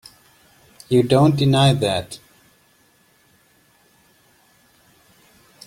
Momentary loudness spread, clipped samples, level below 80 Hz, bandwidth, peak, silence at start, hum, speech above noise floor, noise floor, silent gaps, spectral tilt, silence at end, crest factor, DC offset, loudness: 17 LU; under 0.1%; -54 dBFS; 15 kHz; -2 dBFS; 0.9 s; none; 42 dB; -58 dBFS; none; -6.5 dB/octave; 3.5 s; 20 dB; under 0.1%; -17 LUFS